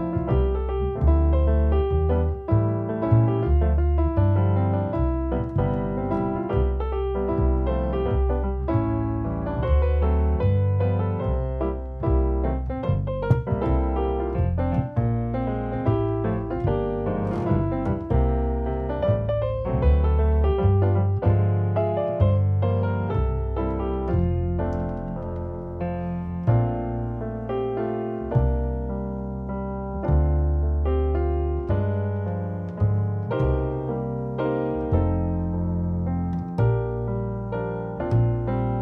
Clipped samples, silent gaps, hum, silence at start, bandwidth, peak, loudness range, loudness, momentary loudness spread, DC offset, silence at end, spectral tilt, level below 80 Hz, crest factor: under 0.1%; none; none; 0 s; 3.7 kHz; -6 dBFS; 4 LU; -24 LUFS; 7 LU; under 0.1%; 0 s; -11.5 dB/octave; -28 dBFS; 16 dB